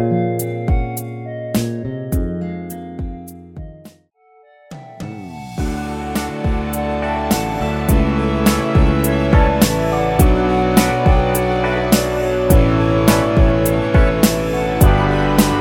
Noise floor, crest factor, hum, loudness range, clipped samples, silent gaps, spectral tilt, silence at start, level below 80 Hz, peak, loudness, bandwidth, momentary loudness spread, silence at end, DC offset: -52 dBFS; 16 dB; none; 13 LU; under 0.1%; none; -6 dB/octave; 0 s; -22 dBFS; 0 dBFS; -16 LUFS; 19 kHz; 15 LU; 0 s; under 0.1%